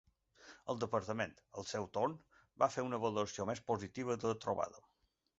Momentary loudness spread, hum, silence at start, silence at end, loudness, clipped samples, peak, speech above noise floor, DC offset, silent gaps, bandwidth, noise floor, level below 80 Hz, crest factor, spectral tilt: 8 LU; none; 0.4 s; 0.6 s; -39 LUFS; under 0.1%; -16 dBFS; 24 dB; under 0.1%; none; 8 kHz; -62 dBFS; -70 dBFS; 24 dB; -4.5 dB/octave